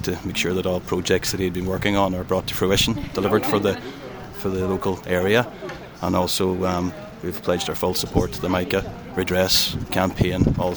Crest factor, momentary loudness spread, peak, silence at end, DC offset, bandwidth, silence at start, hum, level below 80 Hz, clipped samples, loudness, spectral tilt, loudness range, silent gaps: 20 dB; 11 LU; -4 dBFS; 0 s; under 0.1%; over 20 kHz; 0 s; none; -40 dBFS; under 0.1%; -22 LUFS; -4.5 dB/octave; 2 LU; none